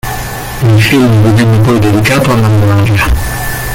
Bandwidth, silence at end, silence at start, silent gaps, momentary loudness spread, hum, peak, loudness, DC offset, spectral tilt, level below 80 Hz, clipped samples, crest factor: 17 kHz; 0 s; 0.05 s; none; 9 LU; none; 0 dBFS; -9 LUFS; under 0.1%; -6 dB/octave; -22 dBFS; under 0.1%; 8 dB